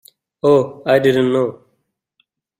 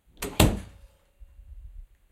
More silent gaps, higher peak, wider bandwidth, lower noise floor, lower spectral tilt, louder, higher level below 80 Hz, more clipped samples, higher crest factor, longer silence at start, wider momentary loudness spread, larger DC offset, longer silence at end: neither; about the same, -2 dBFS vs 0 dBFS; about the same, 16 kHz vs 16 kHz; first, -69 dBFS vs -54 dBFS; first, -7 dB/octave vs -4.5 dB/octave; first, -16 LUFS vs -25 LUFS; second, -58 dBFS vs -36 dBFS; neither; second, 16 dB vs 30 dB; first, 0.45 s vs 0.2 s; second, 6 LU vs 26 LU; neither; first, 1.05 s vs 0.25 s